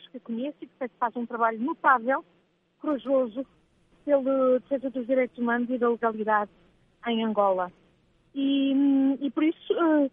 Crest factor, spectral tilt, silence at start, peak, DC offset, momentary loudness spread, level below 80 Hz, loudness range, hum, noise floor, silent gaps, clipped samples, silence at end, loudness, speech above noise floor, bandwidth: 20 dB; -8.5 dB/octave; 0.15 s; -8 dBFS; under 0.1%; 14 LU; -72 dBFS; 1 LU; none; -64 dBFS; none; under 0.1%; 0.05 s; -26 LUFS; 39 dB; 3.8 kHz